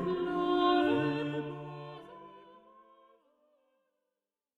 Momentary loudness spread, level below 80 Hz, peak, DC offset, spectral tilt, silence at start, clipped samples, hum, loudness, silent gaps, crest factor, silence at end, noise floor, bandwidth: 24 LU; -68 dBFS; -18 dBFS; under 0.1%; -7.5 dB/octave; 0 s; under 0.1%; none; -31 LUFS; none; 18 dB; 2 s; -89 dBFS; 7.2 kHz